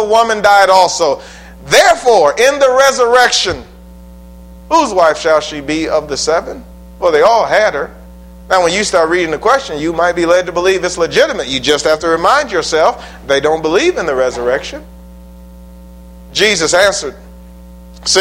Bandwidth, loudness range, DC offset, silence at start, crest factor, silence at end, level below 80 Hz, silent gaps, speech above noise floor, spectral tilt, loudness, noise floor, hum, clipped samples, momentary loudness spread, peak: 16.5 kHz; 6 LU; under 0.1%; 0 s; 12 dB; 0 s; -38 dBFS; none; 23 dB; -2.5 dB/octave; -11 LUFS; -35 dBFS; none; 0.2%; 10 LU; 0 dBFS